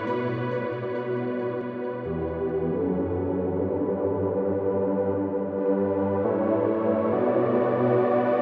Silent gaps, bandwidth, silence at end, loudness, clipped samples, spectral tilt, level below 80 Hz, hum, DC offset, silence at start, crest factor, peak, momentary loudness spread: none; 4.8 kHz; 0 s; -26 LUFS; under 0.1%; -11 dB/octave; -56 dBFS; none; under 0.1%; 0 s; 14 dB; -10 dBFS; 7 LU